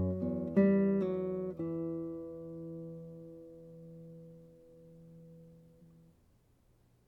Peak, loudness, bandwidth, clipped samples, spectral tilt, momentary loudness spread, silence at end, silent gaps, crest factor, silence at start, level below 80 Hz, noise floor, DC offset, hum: -16 dBFS; -34 LUFS; 3.9 kHz; under 0.1%; -11 dB/octave; 27 LU; 1.2 s; none; 20 dB; 0 s; -66 dBFS; -68 dBFS; under 0.1%; none